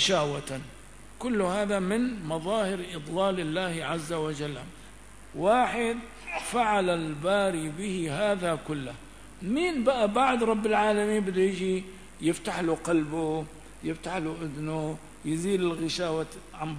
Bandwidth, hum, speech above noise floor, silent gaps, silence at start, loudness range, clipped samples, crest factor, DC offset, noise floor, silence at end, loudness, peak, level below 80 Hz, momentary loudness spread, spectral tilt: 11 kHz; none; 21 dB; none; 0 s; 5 LU; under 0.1%; 18 dB; 0.3%; -49 dBFS; 0 s; -28 LUFS; -10 dBFS; -54 dBFS; 13 LU; -5 dB/octave